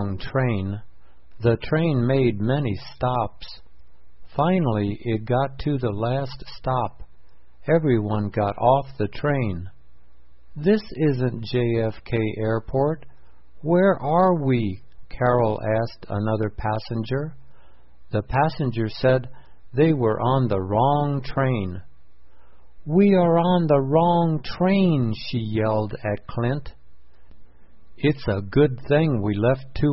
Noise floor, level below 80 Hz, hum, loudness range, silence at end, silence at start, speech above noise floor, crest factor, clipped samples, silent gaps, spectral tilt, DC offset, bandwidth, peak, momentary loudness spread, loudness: -54 dBFS; -44 dBFS; none; 5 LU; 0 s; 0 s; 33 dB; 18 dB; under 0.1%; none; -11.5 dB/octave; 1%; 5.8 kHz; -4 dBFS; 10 LU; -23 LUFS